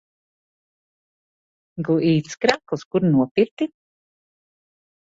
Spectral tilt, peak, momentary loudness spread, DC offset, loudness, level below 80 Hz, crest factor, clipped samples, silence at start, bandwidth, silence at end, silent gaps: -6.5 dB/octave; -2 dBFS; 10 LU; under 0.1%; -21 LUFS; -62 dBFS; 24 dB; under 0.1%; 1.75 s; 7.8 kHz; 1.45 s; 2.85-2.91 s, 3.31-3.35 s, 3.51-3.57 s